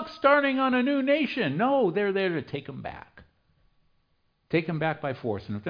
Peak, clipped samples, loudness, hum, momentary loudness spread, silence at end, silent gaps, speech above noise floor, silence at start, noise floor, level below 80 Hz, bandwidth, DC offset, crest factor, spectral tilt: -8 dBFS; under 0.1%; -26 LUFS; none; 14 LU; 0 s; none; 45 dB; 0 s; -71 dBFS; -64 dBFS; 5.2 kHz; under 0.1%; 20 dB; -8.5 dB/octave